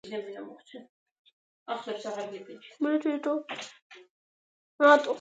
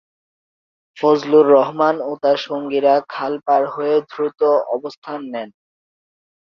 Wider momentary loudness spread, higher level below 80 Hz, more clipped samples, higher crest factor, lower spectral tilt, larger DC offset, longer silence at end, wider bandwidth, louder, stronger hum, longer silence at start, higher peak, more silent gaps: first, 27 LU vs 15 LU; second, -88 dBFS vs -66 dBFS; neither; first, 24 dB vs 16 dB; second, -3.5 dB/octave vs -6.5 dB/octave; neither; second, 0 s vs 1 s; first, 9 kHz vs 6.4 kHz; second, -28 LUFS vs -17 LUFS; neither; second, 0.05 s vs 0.95 s; second, -6 dBFS vs -2 dBFS; first, 0.89-1.25 s, 1.33-1.66 s, 3.82-3.90 s, 4.10-4.79 s vs 4.97-5.02 s